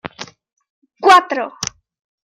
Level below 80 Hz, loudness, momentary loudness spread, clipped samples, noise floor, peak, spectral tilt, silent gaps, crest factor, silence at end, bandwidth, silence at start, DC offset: -60 dBFS; -14 LUFS; 23 LU; under 0.1%; -34 dBFS; 0 dBFS; -2 dB/octave; 0.70-0.82 s; 18 dB; 0.7 s; 15.5 kHz; 0.05 s; under 0.1%